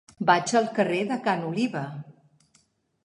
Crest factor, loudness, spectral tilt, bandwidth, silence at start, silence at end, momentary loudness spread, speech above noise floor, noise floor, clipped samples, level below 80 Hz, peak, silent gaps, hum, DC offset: 22 dB; -25 LUFS; -5 dB/octave; 11.5 kHz; 0.2 s; 0.95 s; 13 LU; 41 dB; -66 dBFS; under 0.1%; -72 dBFS; -6 dBFS; none; none; under 0.1%